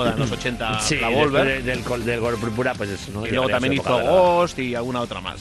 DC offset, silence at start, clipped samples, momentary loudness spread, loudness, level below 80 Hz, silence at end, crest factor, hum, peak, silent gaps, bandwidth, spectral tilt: under 0.1%; 0 s; under 0.1%; 9 LU; -21 LUFS; -42 dBFS; 0 s; 18 dB; none; -4 dBFS; none; 12.5 kHz; -4.5 dB/octave